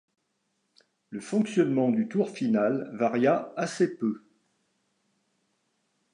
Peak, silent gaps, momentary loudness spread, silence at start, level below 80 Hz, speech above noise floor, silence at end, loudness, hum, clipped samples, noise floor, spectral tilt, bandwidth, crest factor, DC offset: -10 dBFS; none; 8 LU; 1.1 s; -80 dBFS; 50 dB; 1.95 s; -27 LUFS; none; under 0.1%; -76 dBFS; -6.5 dB/octave; 11 kHz; 20 dB; under 0.1%